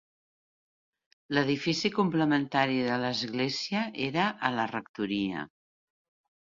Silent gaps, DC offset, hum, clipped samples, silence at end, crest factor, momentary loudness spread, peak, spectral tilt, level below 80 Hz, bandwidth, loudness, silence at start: 4.89-4.94 s; under 0.1%; none; under 0.1%; 1.05 s; 22 dB; 7 LU; -8 dBFS; -5 dB/octave; -68 dBFS; 7.6 kHz; -29 LUFS; 1.3 s